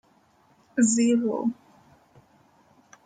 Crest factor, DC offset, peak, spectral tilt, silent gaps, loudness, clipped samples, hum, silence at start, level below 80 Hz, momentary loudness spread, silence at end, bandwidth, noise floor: 18 dB; under 0.1%; -10 dBFS; -4 dB/octave; none; -24 LUFS; under 0.1%; none; 0.75 s; -72 dBFS; 12 LU; 1.55 s; 9.4 kHz; -62 dBFS